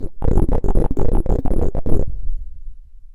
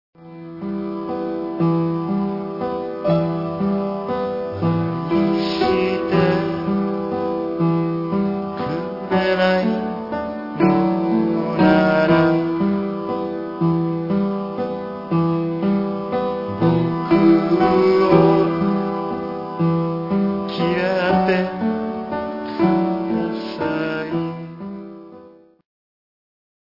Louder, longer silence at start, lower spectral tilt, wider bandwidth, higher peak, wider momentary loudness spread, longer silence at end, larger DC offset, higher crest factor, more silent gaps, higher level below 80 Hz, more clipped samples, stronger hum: second, -23 LUFS vs -20 LUFS; second, 0 s vs 0.2 s; about the same, -10 dB/octave vs -9 dB/octave; second, 2.1 kHz vs 5.8 kHz; about the same, 0 dBFS vs -2 dBFS; first, 14 LU vs 11 LU; second, 0.1 s vs 1.45 s; neither; about the same, 14 dB vs 18 dB; neither; first, -20 dBFS vs -54 dBFS; neither; neither